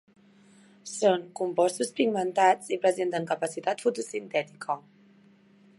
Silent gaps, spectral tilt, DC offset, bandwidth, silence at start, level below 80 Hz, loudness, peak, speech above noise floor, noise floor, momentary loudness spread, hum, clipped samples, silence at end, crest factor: none; -4 dB/octave; under 0.1%; 11.5 kHz; 0.85 s; -84 dBFS; -27 LUFS; -8 dBFS; 31 dB; -58 dBFS; 11 LU; none; under 0.1%; 1 s; 20 dB